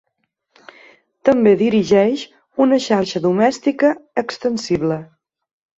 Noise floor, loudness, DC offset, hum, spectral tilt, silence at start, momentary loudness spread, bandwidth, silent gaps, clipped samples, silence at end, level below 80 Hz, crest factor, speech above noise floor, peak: -72 dBFS; -17 LUFS; under 0.1%; none; -6 dB/octave; 1.25 s; 10 LU; 8 kHz; none; under 0.1%; 0.75 s; -56 dBFS; 16 dB; 56 dB; -2 dBFS